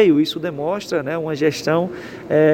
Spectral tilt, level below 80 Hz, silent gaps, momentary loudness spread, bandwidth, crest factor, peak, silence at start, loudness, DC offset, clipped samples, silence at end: -6 dB/octave; -58 dBFS; none; 7 LU; 16.5 kHz; 16 dB; -2 dBFS; 0 s; -20 LUFS; under 0.1%; under 0.1%; 0 s